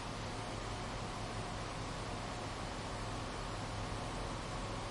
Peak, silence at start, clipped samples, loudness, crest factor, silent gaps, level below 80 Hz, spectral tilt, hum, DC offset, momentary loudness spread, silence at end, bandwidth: -28 dBFS; 0 s; under 0.1%; -42 LUFS; 14 dB; none; -50 dBFS; -4.5 dB/octave; none; under 0.1%; 1 LU; 0 s; 11.5 kHz